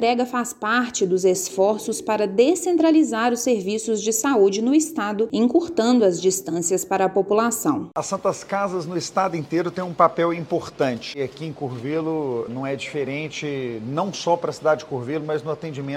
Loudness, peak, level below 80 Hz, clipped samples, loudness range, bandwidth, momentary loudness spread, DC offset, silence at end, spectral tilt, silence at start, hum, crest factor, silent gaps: -22 LUFS; -2 dBFS; -64 dBFS; under 0.1%; 6 LU; 16.5 kHz; 9 LU; under 0.1%; 0 s; -4.5 dB/octave; 0 s; none; 20 dB; none